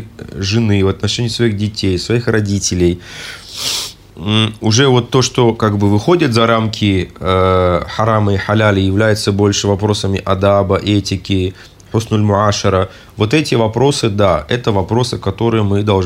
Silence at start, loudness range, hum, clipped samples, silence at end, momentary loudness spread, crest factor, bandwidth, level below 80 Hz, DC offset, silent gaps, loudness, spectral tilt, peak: 0 s; 3 LU; none; under 0.1%; 0 s; 6 LU; 14 dB; 16 kHz; -42 dBFS; under 0.1%; none; -14 LUFS; -5.5 dB/octave; 0 dBFS